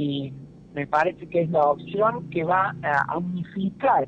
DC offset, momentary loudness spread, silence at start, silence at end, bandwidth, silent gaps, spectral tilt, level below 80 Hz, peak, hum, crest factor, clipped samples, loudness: under 0.1%; 10 LU; 0 s; 0 s; 8.2 kHz; none; -8 dB/octave; -58 dBFS; -8 dBFS; none; 16 dB; under 0.1%; -24 LUFS